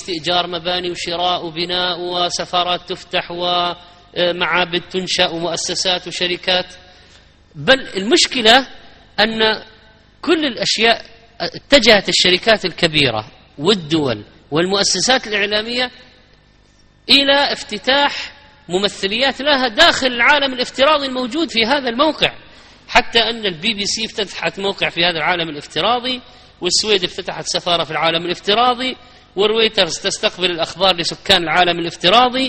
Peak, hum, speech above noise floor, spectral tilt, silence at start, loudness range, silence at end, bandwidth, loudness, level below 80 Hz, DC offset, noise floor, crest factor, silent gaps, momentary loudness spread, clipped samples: 0 dBFS; none; 34 dB; -2.5 dB/octave; 0 s; 4 LU; 0 s; 9 kHz; -16 LUFS; -46 dBFS; under 0.1%; -50 dBFS; 18 dB; none; 11 LU; under 0.1%